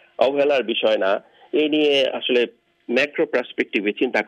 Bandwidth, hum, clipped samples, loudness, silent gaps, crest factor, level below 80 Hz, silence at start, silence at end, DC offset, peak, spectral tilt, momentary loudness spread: 9.4 kHz; none; under 0.1%; -20 LUFS; none; 18 dB; -76 dBFS; 0.2 s; 0.05 s; under 0.1%; -4 dBFS; -4.5 dB/octave; 6 LU